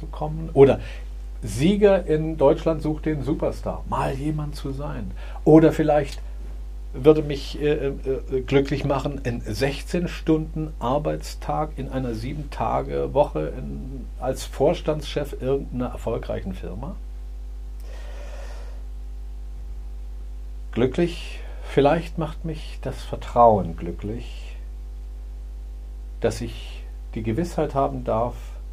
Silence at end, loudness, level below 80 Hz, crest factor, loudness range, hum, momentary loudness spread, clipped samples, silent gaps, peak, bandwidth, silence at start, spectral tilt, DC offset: 0 s; -23 LUFS; -34 dBFS; 22 dB; 12 LU; none; 20 LU; under 0.1%; none; 0 dBFS; 15 kHz; 0 s; -7 dB/octave; under 0.1%